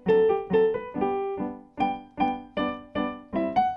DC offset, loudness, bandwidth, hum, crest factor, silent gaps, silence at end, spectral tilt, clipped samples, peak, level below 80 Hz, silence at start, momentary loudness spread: under 0.1%; -27 LUFS; 5.4 kHz; none; 14 dB; none; 0 s; -8.5 dB/octave; under 0.1%; -12 dBFS; -54 dBFS; 0.05 s; 9 LU